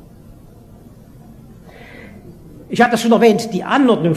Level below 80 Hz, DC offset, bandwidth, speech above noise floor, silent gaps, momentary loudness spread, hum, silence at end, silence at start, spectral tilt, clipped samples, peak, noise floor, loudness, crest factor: -48 dBFS; under 0.1%; 14.5 kHz; 28 dB; none; 26 LU; none; 0 s; 1.65 s; -5.5 dB/octave; under 0.1%; 0 dBFS; -41 dBFS; -14 LUFS; 18 dB